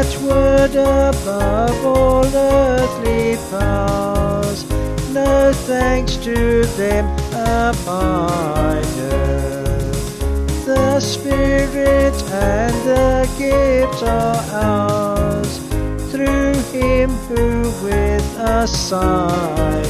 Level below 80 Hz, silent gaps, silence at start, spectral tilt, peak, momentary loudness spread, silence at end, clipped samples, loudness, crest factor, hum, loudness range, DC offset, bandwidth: -24 dBFS; none; 0 s; -5.5 dB/octave; -2 dBFS; 7 LU; 0 s; under 0.1%; -17 LUFS; 14 dB; none; 3 LU; under 0.1%; 14 kHz